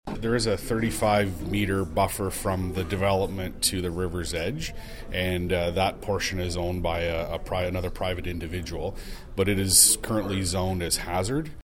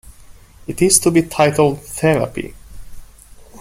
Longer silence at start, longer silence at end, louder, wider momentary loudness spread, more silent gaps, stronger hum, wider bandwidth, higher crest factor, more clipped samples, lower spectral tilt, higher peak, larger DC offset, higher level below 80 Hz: about the same, 0.05 s vs 0.05 s; about the same, 0 s vs 0.05 s; second, -26 LUFS vs -15 LUFS; second, 9 LU vs 18 LU; neither; neither; about the same, 17 kHz vs 16.5 kHz; first, 24 dB vs 18 dB; neither; about the same, -3.5 dB/octave vs -4.5 dB/octave; about the same, -2 dBFS vs 0 dBFS; neither; about the same, -38 dBFS vs -42 dBFS